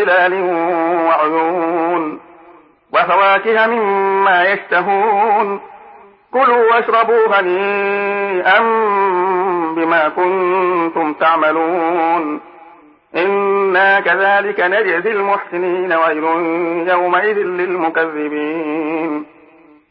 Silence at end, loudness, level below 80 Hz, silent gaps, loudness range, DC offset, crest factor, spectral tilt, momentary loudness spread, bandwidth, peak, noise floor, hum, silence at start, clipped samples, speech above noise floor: 0.65 s; -14 LUFS; -68 dBFS; none; 3 LU; under 0.1%; 14 dB; -10 dB/octave; 8 LU; 5.4 kHz; 0 dBFS; -46 dBFS; none; 0 s; under 0.1%; 31 dB